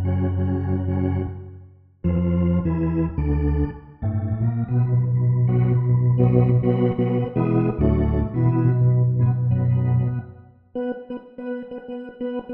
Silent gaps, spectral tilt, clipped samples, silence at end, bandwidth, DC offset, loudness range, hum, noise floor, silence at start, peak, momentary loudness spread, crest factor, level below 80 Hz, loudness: none; -13 dB/octave; under 0.1%; 0 s; 3.2 kHz; under 0.1%; 4 LU; none; -46 dBFS; 0 s; -4 dBFS; 13 LU; 16 dB; -34 dBFS; -22 LUFS